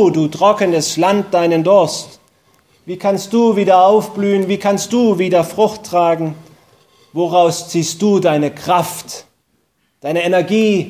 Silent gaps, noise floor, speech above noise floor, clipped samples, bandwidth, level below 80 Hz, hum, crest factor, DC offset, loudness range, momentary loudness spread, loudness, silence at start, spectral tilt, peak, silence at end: none; -63 dBFS; 49 dB; under 0.1%; 16 kHz; -60 dBFS; none; 14 dB; under 0.1%; 3 LU; 12 LU; -14 LUFS; 0 s; -5 dB/octave; 0 dBFS; 0 s